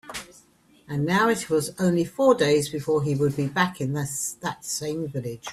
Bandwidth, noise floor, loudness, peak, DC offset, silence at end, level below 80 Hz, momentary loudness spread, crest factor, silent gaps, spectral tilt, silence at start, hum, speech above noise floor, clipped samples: 15.5 kHz; -57 dBFS; -24 LUFS; -6 dBFS; under 0.1%; 0 s; -60 dBFS; 11 LU; 20 dB; none; -5 dB/octave; 0.05 s; none; 33 dB; under 0.1%